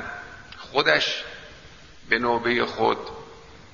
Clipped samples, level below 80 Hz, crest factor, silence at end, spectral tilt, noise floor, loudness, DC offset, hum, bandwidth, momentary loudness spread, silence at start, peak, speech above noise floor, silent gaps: under 0.1%; -54 dBFS; 24 dB; 0.05 s; -3.5 dB/octave; -47 dBFS; -23 LUFS; 0.2%; none; 7.4 kHz; 22 LU; 0 s; -2 dBFS; 24 dB; none